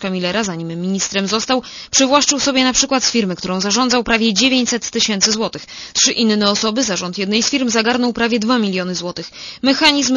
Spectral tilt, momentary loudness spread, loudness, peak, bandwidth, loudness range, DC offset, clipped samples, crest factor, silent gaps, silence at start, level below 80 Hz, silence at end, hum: -2.5 dB/octave; 9 LU; -15 LUFS; 0 dBFS; 11 kHz; 2 LU; under 0.1%; under 0.1%; 16 dB; none; 0 s; -48 dBFS; 0 s; none